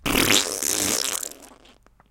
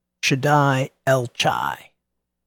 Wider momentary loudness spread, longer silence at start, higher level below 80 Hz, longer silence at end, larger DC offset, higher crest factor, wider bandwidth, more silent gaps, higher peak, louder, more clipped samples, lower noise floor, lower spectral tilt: about the same, 11 LU vs 9 LU; second, 0.05 s vs 0.25 s; first, -44 dBFS vs -62 dBFS; about the same, 0.6 s vs 0.7 s; neither; first, 24 dB vs 18 dB; about the same, 17 kHz vs 18 kHz; neither; first, 0 dBFS vs -4 dBFS; about the same, -21 LUFS vs -20 LUFS; neither; second, -54 dBFS vs -78 dBFS; second, -1 dB/octave vs -5 dB/octave